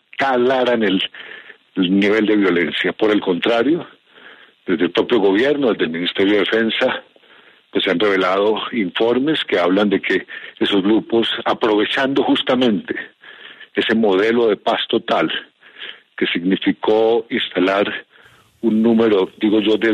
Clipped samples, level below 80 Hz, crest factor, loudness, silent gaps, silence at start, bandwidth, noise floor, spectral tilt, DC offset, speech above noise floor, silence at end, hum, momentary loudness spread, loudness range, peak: under 0.1%; -60 dBFS; 14 dB; -17 LUFS; none; 0.2 s; 9.6 kHz; -50 dBFS; -6 dB/octave; under 0.1%; 33 dB; 0 s; none; 11 LU; 2 LU; -4 dBFS